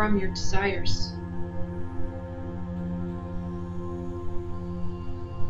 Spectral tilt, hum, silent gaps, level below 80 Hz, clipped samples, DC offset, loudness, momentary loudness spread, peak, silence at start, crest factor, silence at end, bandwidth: -5.5 dB/octave; none; none; -36 dBFS; under 0.1%; under 0.1%; -33 LUFS; 9 LU; -10 dBFS; 0 s; 16 dB; 0 s; 7.8 kHz